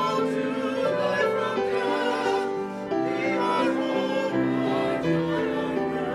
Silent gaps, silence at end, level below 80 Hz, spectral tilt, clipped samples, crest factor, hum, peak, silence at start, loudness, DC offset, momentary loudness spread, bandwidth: none; 0 s; -60 dBFS; -6 dB/octave; under 0.1%; 14 dB; none; -12 dBFS; 0 s; -25 LUFS; under 0.1%; 3 LU; 13.5 kHz